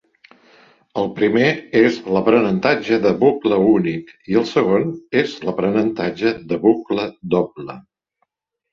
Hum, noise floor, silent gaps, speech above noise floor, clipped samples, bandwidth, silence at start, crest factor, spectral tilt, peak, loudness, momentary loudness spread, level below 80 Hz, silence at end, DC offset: none; -71 dBFS; none; 53 dB; under 0.1%; 7.2 kHz; 0.95 s; 18 dB; -7 dB/octave; 0 dBFS; -18 LUFS; 9 LU; -56 dBFS; 0.9 s; under 0.1%